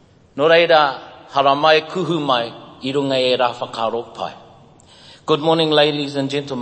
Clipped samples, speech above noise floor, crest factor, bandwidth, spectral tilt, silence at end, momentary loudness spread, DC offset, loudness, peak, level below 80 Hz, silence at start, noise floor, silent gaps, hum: under 0.1%; 29 dB; 18 dB; 8.8 kHz; -5 dB/octave; 0 s; 16 LU; under 0.1%; -17 LUFS; 0 dBFS; -62 dBFS; 0.35 s; -46 dBFS; none; none